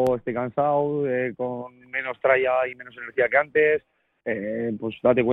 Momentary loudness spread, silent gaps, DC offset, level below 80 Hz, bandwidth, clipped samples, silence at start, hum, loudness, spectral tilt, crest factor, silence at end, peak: 10 LU; none; under 0.1%; -60 dBFS; 4.9 kHz; under 0.1%; 0 s; none; -24 LUFS; -8 dB/octave; 18 dB; 0 s; -6 dBFS